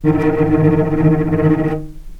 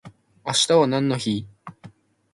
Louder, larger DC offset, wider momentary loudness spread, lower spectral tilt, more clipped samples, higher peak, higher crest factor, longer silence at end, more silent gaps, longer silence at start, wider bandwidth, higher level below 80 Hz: first, -15 LUFS vs -21 LUFS; neither; second, 5 LU vs 15 LU; first, -10.5 dB/octave vs -4 dB/octave; neither; first, 0 dBFS vs -4 dBFS; about the same, 14 dB vs 18 dB; second, 0 s vs 0.45 s; neither; about the same, 0 s vs 0.05 s; second, 4.3 kHz vs 11.5 kHz; first, -30 dBFS vs -60 dBFS